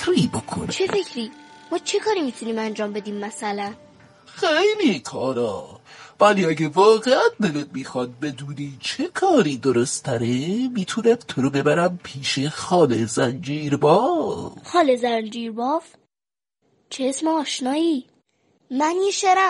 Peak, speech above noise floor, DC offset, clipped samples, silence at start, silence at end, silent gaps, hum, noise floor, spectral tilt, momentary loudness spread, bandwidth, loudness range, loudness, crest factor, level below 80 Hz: -4 dBFS; over 69 dB; under 0.1%; under 0.1%; 0 s; 0 s; none; none; under -90 dBFS; -4.5 dB/octave; 12 LU; 11.5 kHz; 5 LU; -22 LUFS; 18 dB; -62 dBFS